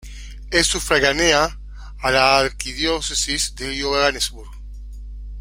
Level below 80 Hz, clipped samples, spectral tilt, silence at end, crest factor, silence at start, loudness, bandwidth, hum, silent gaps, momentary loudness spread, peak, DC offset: -34 dBFS; under 0.1%; -2 dB/octave; 0 s; 20 dB; 0 s; -18 LUFS; 16.5 kHz; 50 Hz at -35 dBFS; none; 23 LU; -2 dBFS; under 0.1%